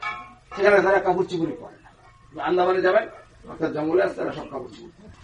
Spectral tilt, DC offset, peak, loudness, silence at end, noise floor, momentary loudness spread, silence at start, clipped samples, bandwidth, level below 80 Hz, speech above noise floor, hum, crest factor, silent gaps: -6.5 dB/octave; under 0.1%; -6 dBFS; -22 LUFS; 0.15 s; -51 dBFS; 20 LU; 0 s; under 0.1%; 9.4 kHz; -56 dBFS; 28 dB; none; 18 dB; none